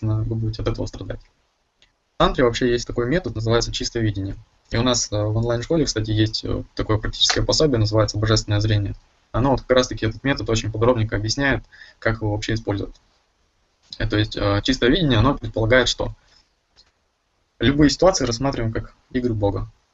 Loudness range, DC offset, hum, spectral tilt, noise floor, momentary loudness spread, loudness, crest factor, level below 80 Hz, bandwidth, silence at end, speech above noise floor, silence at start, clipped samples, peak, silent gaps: 4 LU; under 0.1%; none; -5 dB/octave; -68 dBFS; 12 LU; -21 LUFS; 20 dB; -34 dBFS; 8 kHz; 0.25 s; 47 dB; 0 s; under 0.1%; -2 dBFS; none